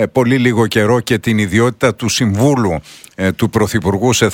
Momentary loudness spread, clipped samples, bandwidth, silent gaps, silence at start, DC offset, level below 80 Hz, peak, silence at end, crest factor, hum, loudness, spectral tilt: 6 LU; under 0.1%; 17.5 kHz; none; 0 s; under 0.1%; -42 dBFS; 0 dBFS; 0 s; 14 dB; none; -14 LUFS; -5 dB/octave